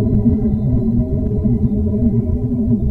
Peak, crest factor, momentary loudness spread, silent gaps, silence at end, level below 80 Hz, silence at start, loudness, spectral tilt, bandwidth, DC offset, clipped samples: -4 dBFS; 12 dB; 3 LU; none; 0 s; -24 dBFS; 0 s; -17 LUFS; -13.5 dB/octave; 2.1 kHz; under 0.1%; under 0.1%